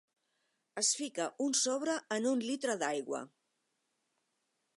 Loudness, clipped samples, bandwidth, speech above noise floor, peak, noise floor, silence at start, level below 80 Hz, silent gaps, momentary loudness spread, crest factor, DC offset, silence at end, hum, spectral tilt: -34 LUFS; under 0.1%; 11.5 kHz; 48 dB; -18 dBFS; -82 dBFS; 0.75 s; under -90 dBFS; none; 11 LU; 20 dB; under 0.1%; 1.5 s; none; -1.5 dB/octave